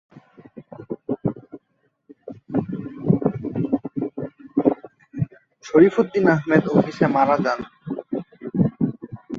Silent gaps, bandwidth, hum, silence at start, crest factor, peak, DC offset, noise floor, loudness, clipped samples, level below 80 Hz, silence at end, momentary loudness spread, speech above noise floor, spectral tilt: none; 7.4 kHz; none; 0.15 s; 20 dB; -2 dBFS; under 0.1%; -69 dBFS; -22 LUFS; under 0.1%; -56 dBFS; 0 s; 18 LU; 51 dB; -8.5 dB/octave